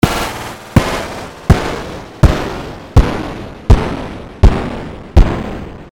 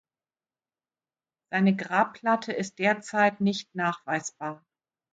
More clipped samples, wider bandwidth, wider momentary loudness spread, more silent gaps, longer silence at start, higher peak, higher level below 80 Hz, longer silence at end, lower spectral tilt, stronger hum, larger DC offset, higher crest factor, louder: first, 1% vs under 0.1%; first, 17.5 kHz vs 9 kHz; about the same, 13 LU vs 11 LU; neither; second, 0.05 s vs 1.5 s; first, 0 dBFS vs -10 dBFS; first, -16 dBFS vs -74 dBFS; second, 0.05 s vs 0.6 s; about the same, -6.5 dB/octave vs -5.5 dB/octave; neither; first, 0.6% vs under 0.1%; second, 14 dB vs 20 dB; first, -16 LUFS vs -27 LUFS